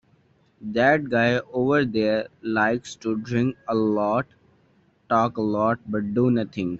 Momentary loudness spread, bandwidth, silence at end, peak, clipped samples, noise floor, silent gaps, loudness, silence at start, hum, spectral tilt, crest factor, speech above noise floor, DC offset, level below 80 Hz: 7 LU; 8 kHz; 0 s; -8 dBFS; under 0.1%; -61 dBFS; none; -23 LUFS; 0.6 s; none; -5.5 dB/octave; 16 dB; 39 dB; under 0.1%; -60 dBFS